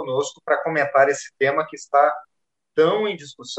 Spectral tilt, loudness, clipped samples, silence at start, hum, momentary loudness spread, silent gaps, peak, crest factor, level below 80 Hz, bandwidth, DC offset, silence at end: -4 dB/octave; -21 LUFS; under 0.1%; 0 s; none; 9 LU; none; -4 dBFS; 18 dB; -74 dBFS; 8.8 kHz; under 0.1%; 0 s